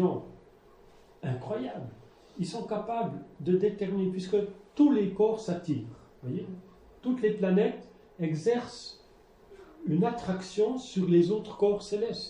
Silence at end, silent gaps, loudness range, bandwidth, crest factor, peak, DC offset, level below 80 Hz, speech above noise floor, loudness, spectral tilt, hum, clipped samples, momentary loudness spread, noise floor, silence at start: 0 s; none; 4 LU; 10.5 kHz; 18 dB; -12 dBFS; under 0.1%; -64 dBFS; 29 dB; -30 LUFS; -7.5 dB/octave; none; under 0.1%; 18 LU; -57 dBFS; 0 s